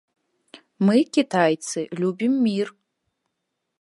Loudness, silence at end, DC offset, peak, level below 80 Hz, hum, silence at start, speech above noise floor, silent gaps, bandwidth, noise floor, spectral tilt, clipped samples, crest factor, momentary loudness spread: -22 LUFS; 1.1 s; under 0.1%; -4 dBFS; -76 dBFS; none; 0.8 s; 58 dB; none; 11.5 kHz; -79 dBFS; -5.5 dB/octave; under 0.1%; 20 dB; 8 LU